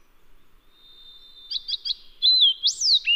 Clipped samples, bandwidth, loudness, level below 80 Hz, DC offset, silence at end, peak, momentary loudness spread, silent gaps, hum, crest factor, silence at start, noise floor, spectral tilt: under 0.1%; 15.5 kHz; -19 LUFS; -56 dBFS; under 0.1%; 0 s; -10 dBFS; 15 LU; none; none; 16 dB; 1.5 s; -52 dBFS; 5 dB/octave